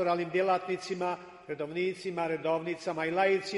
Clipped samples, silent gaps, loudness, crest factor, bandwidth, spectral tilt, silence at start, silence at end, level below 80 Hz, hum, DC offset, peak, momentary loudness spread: under 0.1%; none; -31 LUFS; 18 dB; 11.5 kHz; -5.5 dB/octave; 0 s; 0 s; -74 dBFS; none; under 0.1%; -14 dBFS; 8 LU